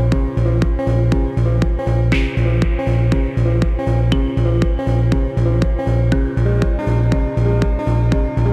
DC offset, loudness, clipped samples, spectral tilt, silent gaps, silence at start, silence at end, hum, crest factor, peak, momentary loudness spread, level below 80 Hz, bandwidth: 0.2%; -17 LUFS; under 0.1%; -8.5 dB/octave; none; 0 s; 0 s; none; 10 dB; -6 dBFS; 1 LU; -20 dBFS; 9 kHz